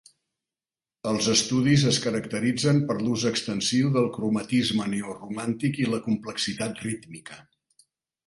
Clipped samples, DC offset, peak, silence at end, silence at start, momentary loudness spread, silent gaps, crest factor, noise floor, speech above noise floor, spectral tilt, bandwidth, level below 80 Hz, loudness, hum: under 0.1%; under 0.1%; -8 dBFS; 0.85 s; 1.05 s; 12 LU; none; 18 dB; under -90 dBFS; over 65 dB; -4.5 dB/octave; 11.5 kHz; -60 dBFS; -25 LUFS; none